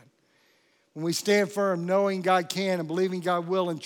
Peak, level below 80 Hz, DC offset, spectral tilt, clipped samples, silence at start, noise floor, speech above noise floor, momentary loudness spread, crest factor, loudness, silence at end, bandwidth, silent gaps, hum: -10 dBFS; -88 dBFS; under 0.1%; -5 dB/octave; under 0.1%; 0.95 s; -66 dBFS; 40 dB; 5 LU; 18 dB; -26 LUFS; 0 s; 18 kHz; none; none